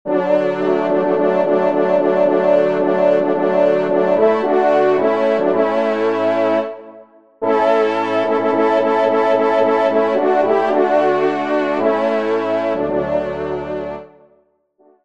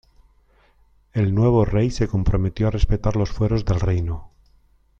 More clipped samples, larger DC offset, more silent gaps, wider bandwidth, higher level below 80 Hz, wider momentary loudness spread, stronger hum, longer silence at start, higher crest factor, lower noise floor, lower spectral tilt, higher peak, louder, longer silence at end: neither; first, 0.5% vs under 0.1%; neither; about the same, 7.6 kHz vs 7.6 kHz; second, -56 dBFS vs -30 dBFS; about the same, 5 LU vs 7 LU; neither; second, 0.05 s vs 1.15 s; about the same, 14 dB vs 16 dB; about the same, -57 dBFS vs -57 dBFS; about the same, -7 dB/octave vs -8 dB/octave; about the same, -2 dBFS vs -4 dBFS; first, -16 LUFS vs -21 LUFS; first, 1 s vs 0.7 s